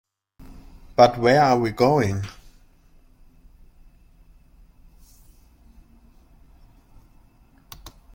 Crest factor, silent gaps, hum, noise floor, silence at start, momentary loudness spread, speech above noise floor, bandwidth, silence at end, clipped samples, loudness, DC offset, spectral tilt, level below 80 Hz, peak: 24 dB; none; none; -55 dBFS; 0.4 s; 27 LU; 37 dB; 16.5 kHz; 0.25 s; under 0.1%; -19 LUFS; under 0.1%; -6 dB/octave; -50 dBFS; -2 dBFS